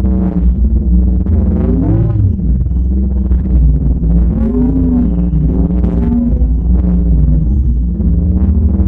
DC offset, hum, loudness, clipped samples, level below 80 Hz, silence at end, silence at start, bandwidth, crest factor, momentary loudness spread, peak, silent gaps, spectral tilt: under 0.1%; none; -13 LUFS; under 0.1%; -12 dBFS; 0 s; 0 s; 1.8 kHz; 10 dB; 3 LU; 0 dBFS; none; -13 dB/octave